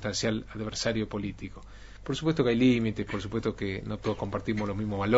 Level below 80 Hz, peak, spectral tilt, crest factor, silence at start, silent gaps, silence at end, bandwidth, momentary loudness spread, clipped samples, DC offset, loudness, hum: -48 dBFS; -8 dBFS; -5.5 dB/octave; 20 dB; 0 s; none; 0 s; 8 kHz; 15 LU; under 0.1%; under 0.1%; -30 LUFS; none